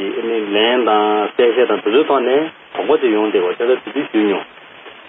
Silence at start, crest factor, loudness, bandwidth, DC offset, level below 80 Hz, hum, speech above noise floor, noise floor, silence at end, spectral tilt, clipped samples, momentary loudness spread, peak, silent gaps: 0 s; 14 dB; -16 LUFS; 3.9 kHz; under 0.1%; -66 dBFS; none; 23 dB; -38 dBFS; 0.1 s; -1.5 dB/octave; under 0.1%; 6 LU; -2 dBFS; none